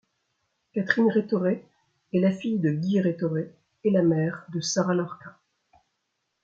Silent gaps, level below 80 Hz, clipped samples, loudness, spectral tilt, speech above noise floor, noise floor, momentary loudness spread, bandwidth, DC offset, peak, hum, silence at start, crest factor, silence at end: none; -70 dBFS; under 0.1%; -26 LUFS; -6 dB/octave; 54 dB; -78 dBFS; 11 LU; 7.8 kHz; under 0.1%; -6 dBFS; none; 0.75 s; 22 dB; 1.15 s